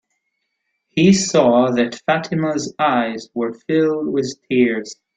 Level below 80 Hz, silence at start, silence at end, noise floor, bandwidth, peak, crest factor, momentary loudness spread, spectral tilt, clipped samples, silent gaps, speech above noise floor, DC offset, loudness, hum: -56 dBFS; 0.95 s; 0.25 s; -73 dBFS; 9.4 kHz; -2 dBFS; 16 dB; 10 LU; -5 dB/octave; under 0.1%; none; 56 dB; under 0.1%; -18 LUFS; none